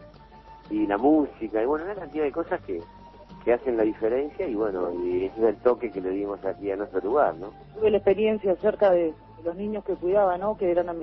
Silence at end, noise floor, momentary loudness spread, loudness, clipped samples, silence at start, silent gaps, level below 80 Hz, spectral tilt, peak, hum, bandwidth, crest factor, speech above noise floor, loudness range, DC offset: 0 s; -48 dBFS; 10 LU; -26 LUFS; under 0.1%; 0 s; none; -52 dBFS; -9.5 dB/octave; -8 dBFS; none; 5.6 kHz; 18 dB; 23 dB; 3 LU; under 0.1%